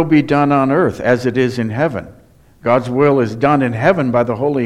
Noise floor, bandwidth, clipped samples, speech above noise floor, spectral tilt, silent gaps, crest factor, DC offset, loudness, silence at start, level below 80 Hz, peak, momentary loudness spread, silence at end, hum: -45 dBFS; 12 kHz; under 0.1%; 31 dB; -8 dB/octave; none; 14 dB; under 0.1%; -15 LUFS; 0 s; -48 dBFS; 0 dBFS; 5 LU; 0 s; none